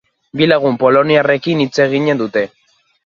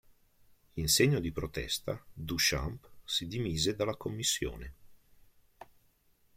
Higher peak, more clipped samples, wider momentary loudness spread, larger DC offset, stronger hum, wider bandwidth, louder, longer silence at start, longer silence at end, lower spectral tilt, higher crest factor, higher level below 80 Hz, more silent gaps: first, 0 dBFS vs -12 dBFS; neither; second, 8 LU vs 15 LU; neither; neither; second, 7.2 kHz vs 16.5 kHz; first, -13 LUFS vs -32 LUFS; second, 0.35 s vs 0.75 s; second, 0.6 s vs 0.75 s; first, -6 dB/octave vs -3.5 dB/octave; second, 14 dB vs 22 dB; second, -58 dBFS vs -50 dBFS; neither